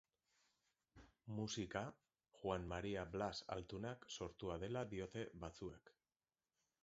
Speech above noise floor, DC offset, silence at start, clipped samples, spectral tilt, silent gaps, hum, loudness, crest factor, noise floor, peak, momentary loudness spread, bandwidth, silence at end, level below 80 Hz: over 42 dB; under 0.1%; 0.95 s; under 0.1%; -4.5 dB/octave; none; none; -48 LUFS; 22 dB; under -90 dBFS; -26 dBFS; 8 LU; 7.6 kHz; 0.95 s; -66 dBFS